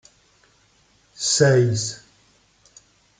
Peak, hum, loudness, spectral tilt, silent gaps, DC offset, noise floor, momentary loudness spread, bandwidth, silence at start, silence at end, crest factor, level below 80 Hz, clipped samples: -2 dBFS; none; -19 LUFS; -4 dB/octave; none; under 0.1%; -60 dBFS; 14 LU; 9.6 kHz; 1.2 s; 1.25 s; 22 dB; -62 dBFS; under 0.1%